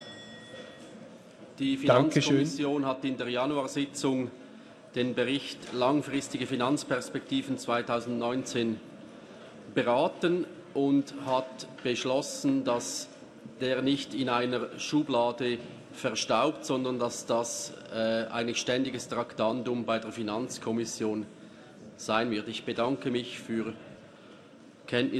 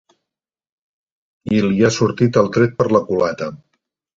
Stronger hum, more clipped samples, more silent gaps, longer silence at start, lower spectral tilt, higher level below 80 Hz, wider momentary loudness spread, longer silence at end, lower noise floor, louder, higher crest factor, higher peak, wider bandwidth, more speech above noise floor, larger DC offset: neither; neither; neither; second, 0 s vs 1.45 s; second, -4.5 dB/octave vs -6.5 dB/octave; second, -70 dBFS vs -52 dBFS; first, 20 LU vs 10 LU; second, 0 s vs 0.6 s; second, -53 dBFS vs -85 dBFS; second, -30 LUFS vs -17 LUFS; about the same, 22 dB vs 18 dB; second, -8 dBFS vs 0 dBFS; first, 13 kHz vs 7.8 kHz; second, 23 dB vs 69 dB; neither